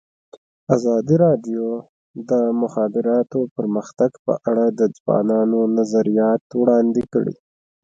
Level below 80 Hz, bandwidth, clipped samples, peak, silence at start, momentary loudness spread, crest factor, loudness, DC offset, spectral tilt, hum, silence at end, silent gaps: -62 dBFS; 7.8 kHz; under 0.1%; 0 dBFS; 0.7 s; 8 LU; 18 dB; -19 LUFS; under 0.1%; -8.5 dB/octave; none; 0.5 s; 1.89-2.14 s, 3.51-3.56 s, 4.19-4.25 s, 5.00-5.06 s, 6.41-6.50 s